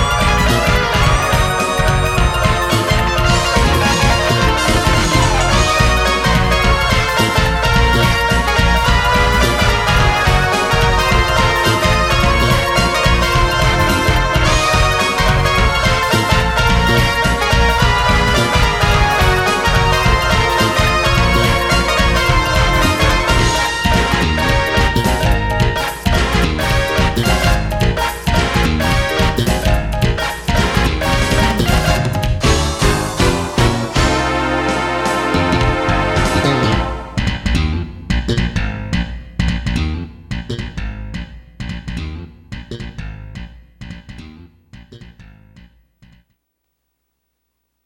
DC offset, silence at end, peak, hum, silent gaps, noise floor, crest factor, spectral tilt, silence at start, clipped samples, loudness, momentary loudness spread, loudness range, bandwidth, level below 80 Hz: under 0.1%; 2.65 s; 0 dBFS; none; none; -71 dBFS; 14 dB; -4.5 dB/octave; 0 s; under 0.1%; -14 LUFS; 9 LU; 9 LU; 16 kHz; -20 dBFS